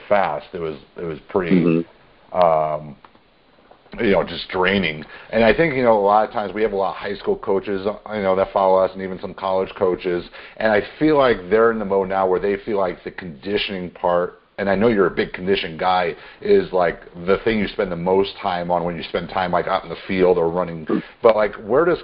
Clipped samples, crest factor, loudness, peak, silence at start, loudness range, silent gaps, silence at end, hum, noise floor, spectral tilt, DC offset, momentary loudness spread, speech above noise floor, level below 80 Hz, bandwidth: under 0.1%; 20 dB; -20 LUFS; 0 dBFS; 0 s; 3 LU; none; 0 s; none; -54 dBFS; -11 dB/octave; under 0.1%; 11 LU; 35 dB; -46 dBFS; 5.4 kHz